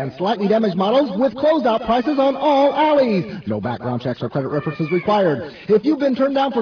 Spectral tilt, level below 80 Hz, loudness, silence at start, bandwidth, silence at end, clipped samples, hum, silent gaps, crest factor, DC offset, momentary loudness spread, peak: -8 dB/octave; -54 dBFS; -18 LUFS; 0 s; 5.4 kHz; 0 s; under 0.1%; none; none; 14 dB; under 0.1%; 8 LU; -4 dBFS